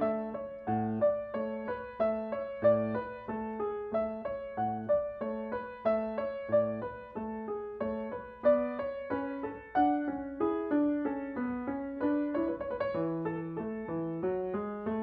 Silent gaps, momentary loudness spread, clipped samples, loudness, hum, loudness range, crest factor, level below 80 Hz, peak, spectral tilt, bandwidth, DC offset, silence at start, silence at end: none; 9 LU; under 0.1%; -33 LUFS; none; 2 LU; 18 dB; -62 dBFS; -14 dBFS; -7 dB/octave; 4.9 kHz; under 0.1%; 0 s; 0 s